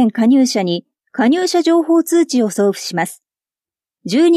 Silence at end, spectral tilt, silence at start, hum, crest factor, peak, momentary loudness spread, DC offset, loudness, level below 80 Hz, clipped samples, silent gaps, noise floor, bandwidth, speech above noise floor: 0 s; -4.5 dB/octave; 0 s; none; 12 dB; -2 dBFS; 11 LU; under 0.1%; -15 LUFS; -74 dBFS; under 0.1%; none; under -90 dBFS; 14 kHz; over 76 dB